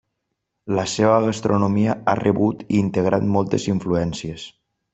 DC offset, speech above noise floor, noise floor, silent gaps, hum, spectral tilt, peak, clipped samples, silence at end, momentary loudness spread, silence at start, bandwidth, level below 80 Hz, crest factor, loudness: under 0.1%; 58 dB; -77 dBFS; none; none; -6.5 dB/octave; -2 dBFS; under 0.1%; 0.45 s; 12 LU; 0.65 s; 8.2 kHz; -52 dBFS; 18 dB; -20 LUFS